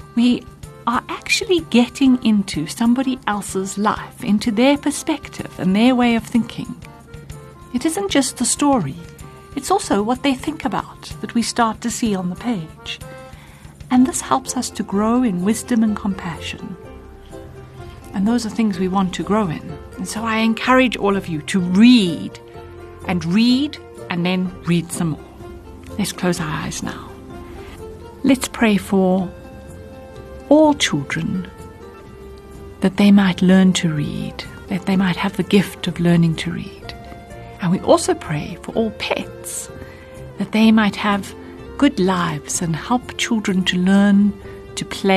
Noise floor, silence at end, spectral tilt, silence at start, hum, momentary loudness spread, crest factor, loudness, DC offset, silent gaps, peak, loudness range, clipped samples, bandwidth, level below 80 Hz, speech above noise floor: -40 dBFS; 0 s; -5 dB/octave; 0 s; none; 22 LU; 18 dB; -18 LUFS; under 0.1%; none; -2 dBFS; 5 LU; under 0.1%; 13 kHz; -44 dBFS; 22 dB